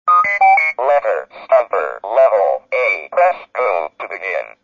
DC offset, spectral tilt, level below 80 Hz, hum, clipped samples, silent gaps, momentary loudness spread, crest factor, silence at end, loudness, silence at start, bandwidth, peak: under 0.1%; -3 dB/octave; -68 dBFS; none; under 0.1%; none; 11 LU; 14 dB; 0.15 s; -15 LUFS; 0.05 s; 7.2 kHz; -2 dBFS